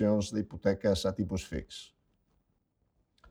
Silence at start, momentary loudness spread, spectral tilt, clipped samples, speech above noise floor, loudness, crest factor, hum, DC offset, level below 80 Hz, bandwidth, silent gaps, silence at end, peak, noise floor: 0 s; 13 LU; -6 dB/octave; under 0.1%; 45 dB; -32 LUFS; 20 dB; none; under 0.1%; -54 dBFS; 14 kHz; none; 1.45 s; -14 dBFS; -76 dBFS